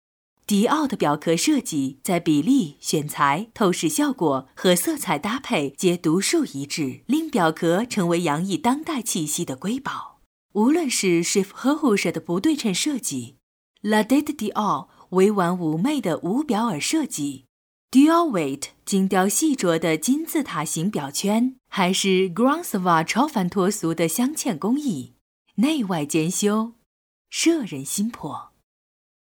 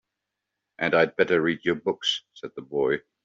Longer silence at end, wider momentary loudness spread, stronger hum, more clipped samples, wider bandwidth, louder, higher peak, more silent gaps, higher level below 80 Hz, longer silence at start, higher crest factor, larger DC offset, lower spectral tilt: first, 0.95 s vs 0.25 s; about the same, 8 LU vs 10 LU; neither; neither; first, over 20 kHz vs 7.8 kHz; first, -22 LUFS vs -25 LUFS; about the same, -4 dBFS vs -6 dBFS; first, 10.26-10.49 s, 13.43-13.74 s, 17.49-17.88 s, 25.21-25.45 s, 26.86-27.25 s vs none; about the same, -66 dBFS vs -66 dBFS; second, 0.5 s vs 0.8 s; about the same, 18 dB vs 20 dB; neither; first, -4.5 dB/octave vs -2.5 dB/octave